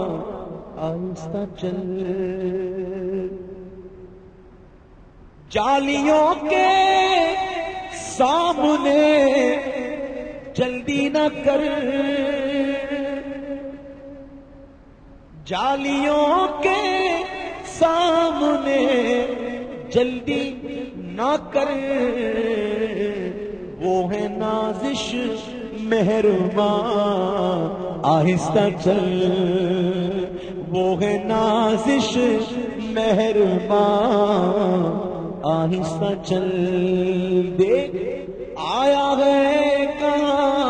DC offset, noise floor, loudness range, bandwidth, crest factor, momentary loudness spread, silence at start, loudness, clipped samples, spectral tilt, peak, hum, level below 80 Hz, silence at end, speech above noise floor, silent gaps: under 0.1%; -47 dBFS; 8 LU; 9.8 kHz; 16 dB; 13 LU; 0 s; -21 LUFS; under 0.1%; -6 dB/octave; -4 dBFS; none; -48 dBFS; 0 s; 27 dB; none